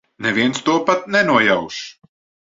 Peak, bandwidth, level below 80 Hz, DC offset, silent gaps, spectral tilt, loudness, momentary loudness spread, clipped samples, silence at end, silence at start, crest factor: -2 dBFS; 7.8 kHz; -58 dBFS; under 0.1%; none; -4 dB/octave; -16 LUFS; 15 LU; under 0.1%; 0.6 s; 0.2 s; 18 dB